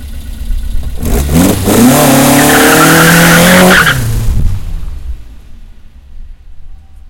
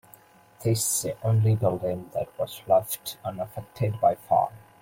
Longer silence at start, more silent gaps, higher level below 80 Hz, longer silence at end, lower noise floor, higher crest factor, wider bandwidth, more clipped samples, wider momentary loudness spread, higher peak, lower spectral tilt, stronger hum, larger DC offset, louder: second, 0 s vs 0.6 s; neither; first, -18 dBFS vs -60 dBFS; second, 0 s vs 0.25 s; second, -31 dBFS vs -54 dBFS; second, 8 dB vs 18 dB; first, over 20 kHz vs 16.5 kHz; first, 3% vs under 0.1%; first, 21 LU vs 11 LU; first, 0 dBFS vs -8 dBFS; second, -4 dB/octave vs -5.5 dB/octave; neither; neither; first, -6 LUFS vs -26 LUFS